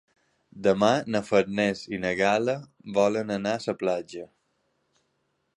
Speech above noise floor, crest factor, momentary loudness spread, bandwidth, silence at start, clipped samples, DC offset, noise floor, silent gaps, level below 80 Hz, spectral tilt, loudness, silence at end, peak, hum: 49 dB; 22 dB; 8 LU; 11 kHz; 0.55 s; under 0.1%; under 0.1%; -74 dBFS; none; -62 dBFS; -5.5 dB/octave; -26 LUFS; 1.3 s; -6 dBFS; none